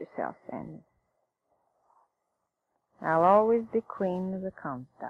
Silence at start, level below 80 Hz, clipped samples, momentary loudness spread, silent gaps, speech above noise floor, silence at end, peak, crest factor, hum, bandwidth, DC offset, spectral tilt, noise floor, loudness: 0 s; -70 dBFS; under 0.1%; 19 LU; none; 53 dB; 0 s; -10 dBFS; 20 dB; none; 6.2 kHz; under 0.1%; -9 dB/octave; -82 dBFS; -28 LUFS